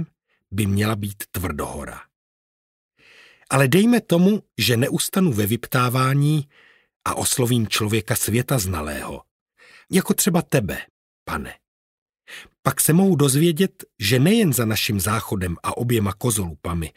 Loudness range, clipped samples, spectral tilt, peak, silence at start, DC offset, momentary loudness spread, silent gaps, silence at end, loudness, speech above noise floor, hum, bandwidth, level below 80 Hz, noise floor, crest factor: 6 LU; under 0.1%; -5 dB/octave; -2 dBFS; 0 s; under 0.1%; 14 LU; 2.16-2.90 s, 6.96-7.00 s, 9.31-9.46 s, 10.90-11.26 s, 11.68-12.06 s, 12.59-12.63 s; 0.1 s; -20 LUFS; 31 dB; none; 16 kHz; -46 dBFS; -51 dBFS; 20 dB